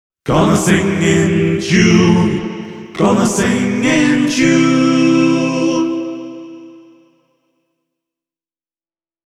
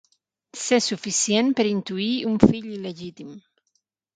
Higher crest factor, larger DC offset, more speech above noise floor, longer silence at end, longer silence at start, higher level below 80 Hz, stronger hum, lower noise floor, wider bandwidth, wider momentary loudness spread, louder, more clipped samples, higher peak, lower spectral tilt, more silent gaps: second, 14 dB vs 24 dB; neither; first, over 78 dB vs 51 dB; first, 2.5 s vs 0.75 s; second, 0.25 s vs 0.55 s; first, -42 dBFS vs -52 dBFS; neither; first, under -90 dBFS vs -73 dBFS; first, 14 kHz vs 9.6 kHz; second, 15 LU vs 18 LU; first, -13 LUFS vs -22 LUFS; neither; about the same, 0 dBFS vs 0 dBFS; first, -5.5 dB/octave vs -4 dB/octave; neither